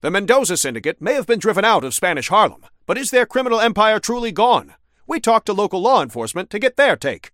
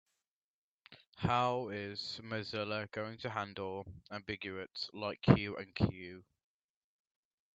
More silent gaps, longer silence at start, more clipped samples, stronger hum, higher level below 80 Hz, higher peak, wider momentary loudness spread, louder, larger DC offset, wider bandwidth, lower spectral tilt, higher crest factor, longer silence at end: second, none vs 1.07-1.13 s; second, 0.05 s vs 0.9 s; neither; neither; first, -52 dBFS vs -62 dBFS; first, 0 dBFS vs -10 dBFS; second, 7 LU vs 15 LU; first, -17 LUFS vs -37 LUFS; neither; first, 16.5 kHz vs 8 kHz; second, -3 dB/octave vs -7 dB/octave; second, 18 dB vs 28 dB; second, 0.05 s vs 1.35 s